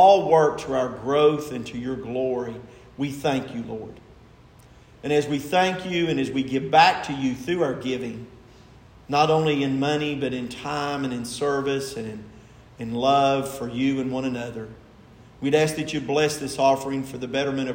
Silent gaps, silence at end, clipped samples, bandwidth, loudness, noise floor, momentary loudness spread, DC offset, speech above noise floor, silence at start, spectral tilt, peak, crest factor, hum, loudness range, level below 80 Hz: none; 0 s; under 0.1%; 16 kHz; -24 LUFS; -50 dBFS; 14 LU; under 0.1%; 27 dB; 0 s; -5 dB/octave; -2 dBFS; 20 dB; none; 5 LU; -56 dBFS